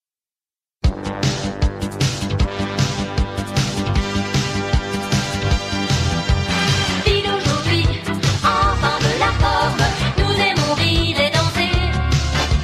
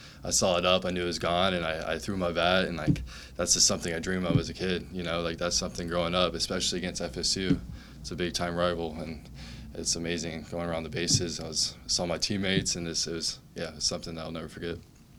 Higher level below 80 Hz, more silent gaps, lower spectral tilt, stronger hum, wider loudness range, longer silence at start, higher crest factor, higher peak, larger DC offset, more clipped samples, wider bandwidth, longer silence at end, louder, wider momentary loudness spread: first, -26 dBFS vs -48 dBFS; neither; first, -4.5 dB/octave vs -3 dB/octave; neither; about the same, 4 LU vs 4 LU; first, 0.85 s vs 0 s; about the same, 16 dB vs 20 dB; first, -2 dBFS vs -10 dBFS; neither; neither; second, 15 kHz vs 18 kHz; about the same, 0 s vs 0 s; first, -18 LUFS vs -29 LUFS; second, 5 LU vs 13 LU